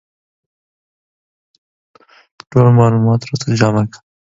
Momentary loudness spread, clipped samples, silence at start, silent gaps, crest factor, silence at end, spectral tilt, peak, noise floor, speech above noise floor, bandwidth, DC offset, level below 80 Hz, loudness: 9 LU; under 0.1%; 2.55 s; none; 16 dB; 0.25 s; -7.5 dB/octave; 0 dBFS; under -90 dBFS; over 78 dB; 7.8 kHz; under 0.1%; -48 dBFS; -14 LUFS